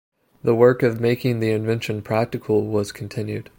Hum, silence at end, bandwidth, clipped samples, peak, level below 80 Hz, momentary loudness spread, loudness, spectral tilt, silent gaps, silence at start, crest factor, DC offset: none; 0.15 s; 16.5 kHz; under 0.1%; -2 dBFS; -58 dBFS; 12 LU; -21 LUFS; -7 dB/octave; none; 0.45 s; 18 dB; under 0.1%